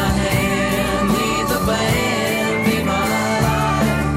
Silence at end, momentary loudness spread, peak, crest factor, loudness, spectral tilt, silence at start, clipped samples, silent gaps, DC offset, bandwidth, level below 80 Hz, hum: 0 s; 1 LU; -4 dBFS; 12 dB; -18 LUFS; -5 dB/octave; 0 s; under 0.1%; none; under 0.1%; 16.5 kHz; -32 dBFS; none